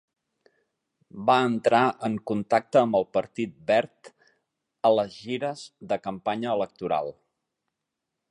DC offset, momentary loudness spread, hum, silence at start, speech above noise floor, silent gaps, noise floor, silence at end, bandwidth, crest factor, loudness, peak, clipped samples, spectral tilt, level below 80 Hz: under 0.1%; 10 LU; none; 1.15 s; 59 dB; none; -84 dBFS; 1.2 s; 11 kHz; 22 dB; -25 LUFS; -6 dBFS; under 0.1%; -6 dB/octave; -68 dBFS